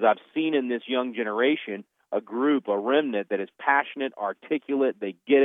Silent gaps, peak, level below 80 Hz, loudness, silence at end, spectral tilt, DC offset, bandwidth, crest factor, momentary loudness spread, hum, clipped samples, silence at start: none; -6 dBFS; under -90 dBFS; -26 LUFS; 0 s; -7.5 dB/octave; under 0.1%; 3.9 kHz; 20 dB; 9 LU; none; under 0.1%; 0 s